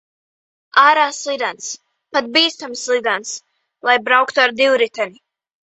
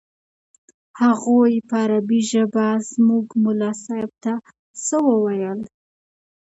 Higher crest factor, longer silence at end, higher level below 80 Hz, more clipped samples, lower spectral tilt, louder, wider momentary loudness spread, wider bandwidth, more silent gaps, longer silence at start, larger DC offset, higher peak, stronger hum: about the same, 18 dB vs 16 dB; second, 0.7 s vs 0.9 s; about the same, -70 dBFS vs -70 dBFS; neither; second, -0.5 dB/octave vs -5.5 dB/octave; first, -16 LUFS vs -20 LUFS; first, 15 LU vs 11 LU; about the same, 8.2 kHz vs 8.2 kHz; second, none vs 4.59-4.74 s; second, 0.75 s vs 0.95 s; neither; first, 0 dBFS vs -4 dBFS; neither